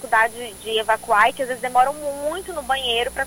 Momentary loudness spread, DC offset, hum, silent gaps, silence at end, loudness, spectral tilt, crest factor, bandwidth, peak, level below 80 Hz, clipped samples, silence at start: 10 LU; under 0.1%; none; none; 0 s; -21 LUFS; -1.5 dB/octave; 18 dB; 17 kHz; -4 dBFS; -48 dBFS; under 0.1%; 0 s